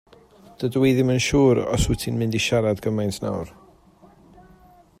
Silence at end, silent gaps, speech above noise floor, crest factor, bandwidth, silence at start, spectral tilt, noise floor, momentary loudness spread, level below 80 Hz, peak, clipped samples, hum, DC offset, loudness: 1.5 s; none; 31 dB; 16 dB; 16 kHz; 0.6 s; -5.5 dB/octave; -52 dBFS; 11 LU; -40 dBFS; -6 dBFS; under 0.1%; none; under 0.1%; -22 LUFS